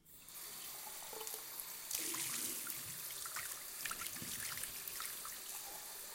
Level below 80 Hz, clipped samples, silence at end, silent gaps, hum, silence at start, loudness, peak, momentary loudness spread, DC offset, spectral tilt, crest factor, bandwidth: -74 dBFS; under 0.1%; 0 s; none; none; 0.05 s; -43 LUFS; -22 dBFS; 8 LU; under 0.1%; 0 dB/octave; 26 dB; 17 kHz